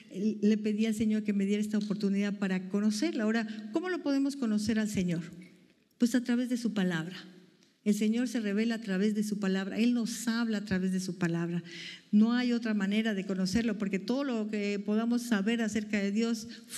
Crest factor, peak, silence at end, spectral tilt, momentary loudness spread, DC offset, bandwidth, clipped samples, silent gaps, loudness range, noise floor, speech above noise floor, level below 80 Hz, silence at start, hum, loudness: 16 dB; -14 dBFS; 0 s; -5.5 dB/octave; 5 LU; under 0.1%; 13 kHz; under 0.1%; none; 2 LU; -62 dBFS; 32 dB; -66 dBFS; 0 s; none; -31 LUFS